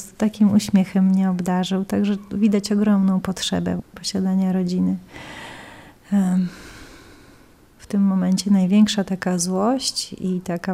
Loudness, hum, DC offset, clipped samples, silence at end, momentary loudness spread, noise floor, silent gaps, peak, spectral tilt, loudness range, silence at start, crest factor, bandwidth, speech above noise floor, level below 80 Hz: -20 LUFS; none; under 0.1%; under 0.1%; 0 s; 11 LU; -50 dBFS; none; -6 dBFS; -6 dB/octave; 6 LU; 0 s; 14 dB; 13.5 kHz; 30 dB; -54 dBFS